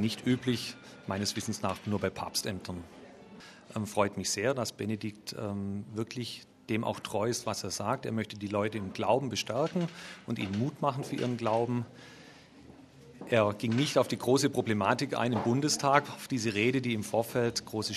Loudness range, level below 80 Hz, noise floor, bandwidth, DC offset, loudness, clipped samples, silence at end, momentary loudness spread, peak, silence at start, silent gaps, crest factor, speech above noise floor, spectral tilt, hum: 6 LU; -68 dBFS; -54 dBFS; 14 kHz; under 0.1%; -31 LUFS; under 0.1%; 0 s; 13 LU; -6 dBFS; 0 s; none; 24 dB; 22 dB; -4.5 dB/octave; none